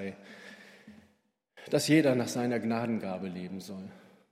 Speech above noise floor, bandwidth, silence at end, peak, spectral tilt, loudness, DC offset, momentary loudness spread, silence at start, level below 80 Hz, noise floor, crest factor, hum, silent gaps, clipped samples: 42 dB; 16 kHz; 0.35 s; -12 dBFS; -5.5 dB/octave; -30 LUFS; under 0.1%; 24 LU; 0 s; -76 dBFS; -73 dBFS; 20 dB; none; none; under 0.1%